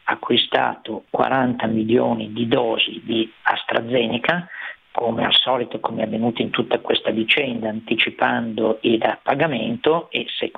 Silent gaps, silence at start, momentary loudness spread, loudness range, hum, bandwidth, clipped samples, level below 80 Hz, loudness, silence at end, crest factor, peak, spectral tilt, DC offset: none; 0.05 s; 7 LU; 1 LU; none; 5 kHz; under 0.1%; -60 dBFS; -20 LUFS; 0.1 s; 18 dB; -2 dBFS; -7.5 dB/octave; under 0.1%